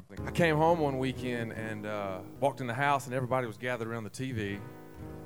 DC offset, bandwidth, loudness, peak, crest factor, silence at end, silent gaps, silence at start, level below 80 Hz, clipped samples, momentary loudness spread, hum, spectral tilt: 0.2%; over 20 kHz; -32 LUFS; -12 dBFS; 20 dB; 0 s; none; 0 s; -56 dBFS; under 0.1%; 11 LU; none; -6 dB/octave